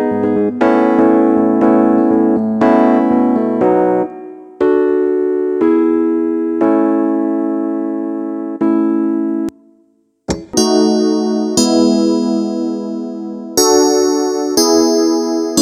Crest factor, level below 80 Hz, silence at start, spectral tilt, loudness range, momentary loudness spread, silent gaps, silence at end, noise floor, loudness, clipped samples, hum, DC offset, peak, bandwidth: 14 dB; -50 dBFS; 0 s; -4.5 dB/octave; 5 LU; 10 LU; none; 0 s; -56 dBFS; -14 LUFS; under 0.1%; none; under 0.1%; 0 dBFS; 14.5 kHz